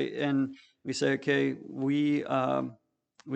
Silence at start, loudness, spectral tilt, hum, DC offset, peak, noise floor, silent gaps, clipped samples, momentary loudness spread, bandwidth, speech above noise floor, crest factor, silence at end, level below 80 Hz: 0 s; -29 LUFS; -6 dB/octave; none; under 0.1%; -14 dBFS; -56 dBFS; none; under 0.1%; 9 LU; 8.8 kHz; 26 dB; 16 dB; 0 s; -76 dBFS